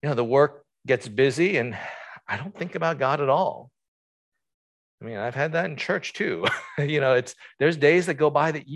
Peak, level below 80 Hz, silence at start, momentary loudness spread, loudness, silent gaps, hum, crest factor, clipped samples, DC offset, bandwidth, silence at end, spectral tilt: -6 dBFS; -68 dBFS; 0.05 s; 14 LU; -24 LUFS; 3.88-4.32 s, 4.54-4.98 s; none; 20 dB; under 0.1%; under 0.1%; 12 kHz; 0 s; -6 dB/octave